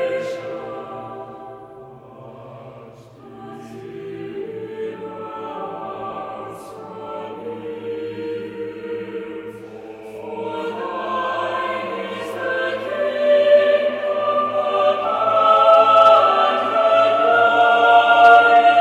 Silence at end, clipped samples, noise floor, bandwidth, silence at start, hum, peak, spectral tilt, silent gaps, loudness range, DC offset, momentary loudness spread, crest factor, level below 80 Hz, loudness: 0 s; under 0.1%; -41 dBFS; 10 kHz; 0 s; none; 0 dBFS; -4.5 dB/octave; none; 20 LU; under 0.1%; 24 LU; 18 dB; -66 dBFS; -16 LUFS